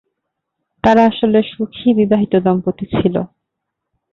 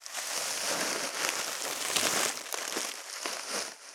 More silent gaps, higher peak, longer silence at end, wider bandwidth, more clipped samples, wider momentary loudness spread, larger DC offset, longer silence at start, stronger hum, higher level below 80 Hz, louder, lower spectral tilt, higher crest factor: neither; about the same, -2 dBFS vs -4 dBFS; first, 0.85 s vs 0 s; second, 6.8 kHz vs over 20 kHz; neither; about the same, 9 LU vs 8 LU; neither; first, 0.85 s vs 0 s; neither; first, -46 dBFS vs -88 dBFS; first, -15 LUFS vs -31 LUFS; first, -8.5 dB/octave vs 0.5 dB/octave; second, 14 dB vs 28 dB